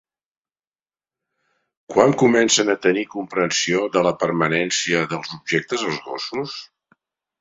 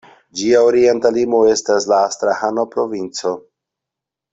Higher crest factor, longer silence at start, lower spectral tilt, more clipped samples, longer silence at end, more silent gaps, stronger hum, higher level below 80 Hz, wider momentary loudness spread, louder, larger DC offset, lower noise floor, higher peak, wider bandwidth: first, 22 dB vs 14 dB; first, 1.9 s vs 0.35 s; about the same, -3.5 dB/octave vs -3.5 dB/octave; neither; second, 0.75 s vs 0.95 s; neither; neither; about the same, -62 dBFS vs -58 dBFS; about the same, 12 LU vs 10 LU; second, -20 LUFS vs -16 LUFS; neither; first, under -90 dBFS vs -84 dBFS; about the same, 0 dBFS vs -2 dBFS; about the same, 7.8 kHz vs 8.2 kHz